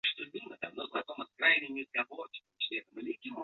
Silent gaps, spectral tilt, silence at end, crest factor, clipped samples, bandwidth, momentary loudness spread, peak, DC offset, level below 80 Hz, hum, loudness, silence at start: none; 1.5 dB/octave; 0 s; 24 dB; under 0.1%; 6.8 kHz; 16 LU; -12 dBFS; under 0.1%; -82 dBFS; none; -34 LUFS; 0.05 s